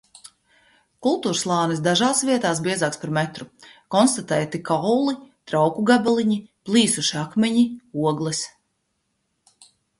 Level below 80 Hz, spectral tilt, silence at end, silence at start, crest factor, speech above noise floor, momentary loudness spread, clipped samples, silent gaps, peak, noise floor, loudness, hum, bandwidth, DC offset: -64 dBFS; -4 dB/octave; 1.5 s; 0.25 s; 18 dB; 52 dB; 8 LU; under 0.1%; none; -4 dBFS; -73 dBFS; -21 LUFS; none; 11.5 kHz; under 0.1%